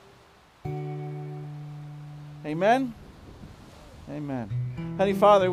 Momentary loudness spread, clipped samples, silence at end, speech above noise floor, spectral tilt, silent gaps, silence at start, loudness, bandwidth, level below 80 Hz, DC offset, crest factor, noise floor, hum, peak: 25 LU; under 0.1%; 0 s; 32 dB; -7 dB/octave; none; 0.65 s; -27 LUFS; 15 kHz; -56 dBFS; under 0.1%; 20 dB; -55 dBFS; none; -6 dBFS